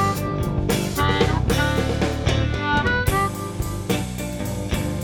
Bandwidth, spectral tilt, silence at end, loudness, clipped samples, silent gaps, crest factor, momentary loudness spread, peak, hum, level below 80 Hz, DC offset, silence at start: 18 kHz; -5 dB/octave; 0 s; -22 LUFS; under 0.1%; none; 16 dB; 8 LU; -6 dBFS; none; -32 dBFS; under 0.1%; 0 s